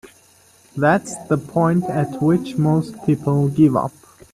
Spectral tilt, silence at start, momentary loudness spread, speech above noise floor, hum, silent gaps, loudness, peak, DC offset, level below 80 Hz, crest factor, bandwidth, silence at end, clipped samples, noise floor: -7.5 dB/octave; 0.05 s; 7 LU; 34 dB; none; none; -19 LUFS; -2 dBFS; under 0.1%; -54 dBFS; 16 dB; 13.5 kHz; 0.45 s; under 0.1%; -52 dBFS